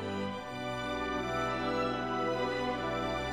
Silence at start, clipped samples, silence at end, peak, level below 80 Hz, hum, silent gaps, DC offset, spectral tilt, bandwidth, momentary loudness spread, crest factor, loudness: 0 s; under 0.1%; 0 s; -22 dBFS; -52 dBFS; none; none; 0.1%; -5.5 dB/octave; 16.5 kHz; 5 LU; 12 dB; -34 LUFS